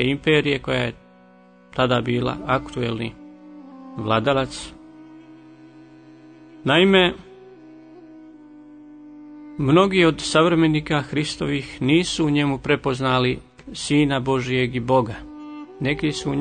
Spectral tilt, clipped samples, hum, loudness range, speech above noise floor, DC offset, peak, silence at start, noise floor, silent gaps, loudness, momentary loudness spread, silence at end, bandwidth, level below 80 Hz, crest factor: -5.5 dB/octave; under 0.1%; none; 6 LU; 30 dB; under 0.1%; -2 dBFS; 0 s; -50 dBFS; none; -20 LUFS; 19 LU; 0 s; 9.6 kHz; -48 dBFS; 20 dB